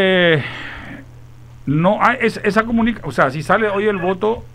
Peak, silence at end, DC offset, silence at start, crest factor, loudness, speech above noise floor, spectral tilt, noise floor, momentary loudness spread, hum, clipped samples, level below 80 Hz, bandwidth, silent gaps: 0 dBFS; 0 s; under 0.1%; 0 s; 16 dB; -17 LUFS; 22 dB; -6.5 dB/octave; -39 dBFS; 16 LU; none; under 0.1%; -42 dBFS; 14 kHz; none